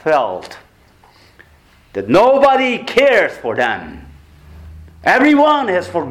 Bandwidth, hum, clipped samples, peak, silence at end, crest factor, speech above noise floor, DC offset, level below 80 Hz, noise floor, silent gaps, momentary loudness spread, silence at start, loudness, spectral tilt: 14 kHz; none; under 0.1%; -2 dBFS; 0 s; 14 dB; 35 dB; under 0.1%; -46 dBFS; -49 dBFS; none; 16 LU; 0.05 s; -13 LUFS; -5 dB/octave